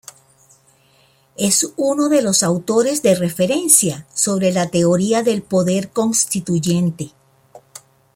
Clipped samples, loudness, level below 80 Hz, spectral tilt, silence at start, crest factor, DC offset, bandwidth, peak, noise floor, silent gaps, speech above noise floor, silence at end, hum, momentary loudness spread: under 0.1%; -16 LUFS; -58 dBFS; -4 dB/octave; 1.4 s; 18 dB; under 0.1%; 16.5 kHz; 0 dBFS; -55 dBFS; none; 39 dB; 0.55 s; none; 7 LU